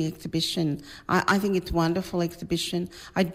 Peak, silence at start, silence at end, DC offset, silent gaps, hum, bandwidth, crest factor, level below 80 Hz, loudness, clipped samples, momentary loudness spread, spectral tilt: -10 dBFS; 0 s; 0 s; under 0.1%; none; none; 16 kHz; 16 dB; -46 dBFS; -27 LUFS; under 0.1%; 7 LU; -5 dB/octave